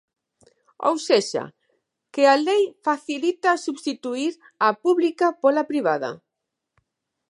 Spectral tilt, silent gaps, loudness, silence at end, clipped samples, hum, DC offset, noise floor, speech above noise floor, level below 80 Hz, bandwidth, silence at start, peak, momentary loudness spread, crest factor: -3.5 dB/octave; none; -22 LUFS; 1.15 s; under 0.1%; none; under 0.1%; -82 dBFS; 61 dB; -80 dBFS; 11.5 kHz; 0.8 s; -4 dBFS; 10 LU; 20 dB